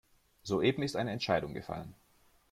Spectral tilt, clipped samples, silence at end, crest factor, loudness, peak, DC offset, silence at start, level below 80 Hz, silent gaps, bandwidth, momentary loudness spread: -5.5 dB/octave; under 0.1%; 0.6 s; 20 dB; -34 LUFS; -14 dBFS; under 0.1%; 0.45 s; -62 dBFS; none; 15 kHz; 15 LU